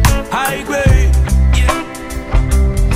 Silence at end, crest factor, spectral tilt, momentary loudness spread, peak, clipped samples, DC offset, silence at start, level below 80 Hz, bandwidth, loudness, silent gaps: 0 s; 12 dB; -5.5 dB/octave; 8 LU; 0 dBFS; under 0.1%; under 0.1%; 0 s; -14 dBFS; 16 kHz; -14 LUFS; none